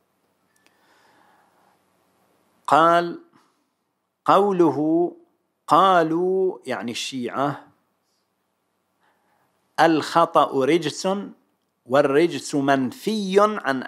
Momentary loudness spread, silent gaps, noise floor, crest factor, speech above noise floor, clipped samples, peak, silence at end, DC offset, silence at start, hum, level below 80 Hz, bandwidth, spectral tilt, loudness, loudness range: 12 LU; none; -75 dBFS; 22 dB; 55 dB; under 0.1%; -2 dBFS; 0 s; under 0.1%; 2.7 s; none; -78 dBFS; 14.5 kHz; -5 dB/octave; -20 LUFS; 6 LU